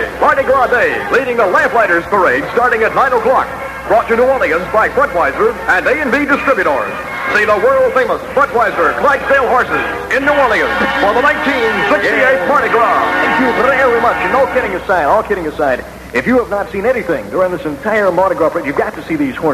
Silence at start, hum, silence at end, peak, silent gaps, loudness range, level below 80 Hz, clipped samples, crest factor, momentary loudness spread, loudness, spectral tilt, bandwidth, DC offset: 0 s; none; 0 s; 0 dBFS; none; 3 LU; -38 dBFS; under 0.1%; 12 dB; 6 LU; -12 LUFS; -5 dB/octave; 14.5 kHz; under 0.1%